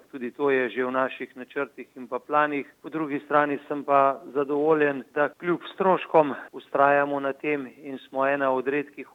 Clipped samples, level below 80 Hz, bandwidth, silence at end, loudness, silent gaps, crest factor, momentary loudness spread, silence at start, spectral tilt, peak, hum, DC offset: under 0.1%; -80 dBFS; 7.8 kHz; 0.1 s; -25 LUFS; none; 20 dB; 14 LU; 0.15 s; -7.5 dB/octave; -6 dBFS; none; under 0.1%